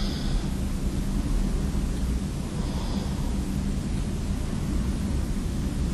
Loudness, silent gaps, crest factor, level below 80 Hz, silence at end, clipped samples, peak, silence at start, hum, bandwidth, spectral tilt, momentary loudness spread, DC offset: -29 LUFS; none; 12 dB; -28 dBFS; 0 s; under 0.1%; -14 dBFS; 0 s; none; 13 kHz; -6 dB/octave; 2 LU; under 0.1%